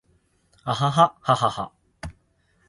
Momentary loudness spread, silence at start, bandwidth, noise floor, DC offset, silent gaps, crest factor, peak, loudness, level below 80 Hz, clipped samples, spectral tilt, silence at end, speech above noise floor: 21 LU; 0.65 s; 11.5 kHz; -65 dBFS; under 0.1%; none; 22 dB; -2 dBFS; -22 LUFS; -52 dBFS; under 0.1%; -5.5 dB/octave; 0.55 s; 43 dB